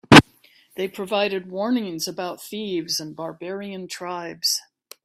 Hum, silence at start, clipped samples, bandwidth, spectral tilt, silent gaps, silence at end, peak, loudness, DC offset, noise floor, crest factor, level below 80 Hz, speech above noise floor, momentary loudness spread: none; 0.1 s; under 0.1%; 16 kHz; -4 dB/octave; none; 0.45 s; 0 dBFS; -23 LUFS; under 0.1%; -56 dBFS; 22 dB; -54 dBFS; 29 dB; 10 LU